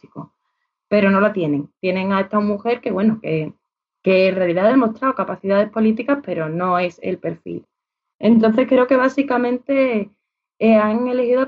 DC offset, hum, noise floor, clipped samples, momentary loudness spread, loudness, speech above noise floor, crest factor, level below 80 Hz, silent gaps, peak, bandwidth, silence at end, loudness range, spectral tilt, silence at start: under 0.1%; none; -74 dBFS; under 0.1%; 11 LU; -18 LUFS; 56 dB; 14 dB; -62 dBFS; 8.15-8.19 s; -4 dBFS; 6.8 kHz; 0 s; 3 LU; -5.5 dB/octave; 0.15 s